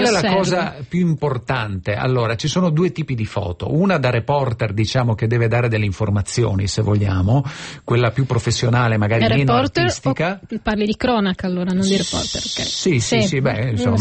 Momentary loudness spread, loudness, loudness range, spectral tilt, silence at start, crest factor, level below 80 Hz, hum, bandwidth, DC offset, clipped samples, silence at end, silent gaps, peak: 6 LU; -19 LUFS; 2 LU; -5.5 dB/octave; 0 s; 14 dB; -42 dBFS; none; 8.8 kHz; under 0.1%; under 0.1%; 0 s; none; -4 dBFS